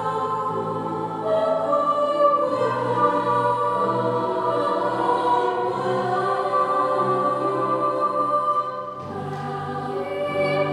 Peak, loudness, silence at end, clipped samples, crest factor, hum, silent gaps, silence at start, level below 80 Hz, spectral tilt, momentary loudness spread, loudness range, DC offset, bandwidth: -6 dBFS; -22 LUFS; 0 s; under 0.1%; 16 dB; none; none; 0 s; -64 dBFS; -6.5 dB/octave; 8 LU; 3 LU; under 0.1%; 12 kHz